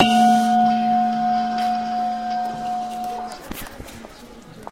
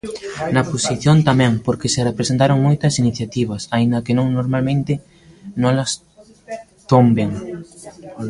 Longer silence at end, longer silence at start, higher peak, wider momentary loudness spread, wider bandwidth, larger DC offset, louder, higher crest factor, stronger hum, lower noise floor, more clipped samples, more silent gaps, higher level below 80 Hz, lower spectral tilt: about the same, 0 s vs 0 s; about the same, 0 s vs 0.05 s; about the same, -2 dBFS vs 0 dBFS; first, 22 LU vs 19 LU; first, 16 kHz vs 11.5 kHz; first, 0.2% vs under 0.1%; second, -20 LUFS vs -17 LUFS; about the same, 20 dB vs 16 dB; neither; first, -42 dBFS vs -38 dBFS; neither; neither; about the same, -50 dBFS vs -46 dBFS; second, -4.5 dB/octave vs -6 dB/octave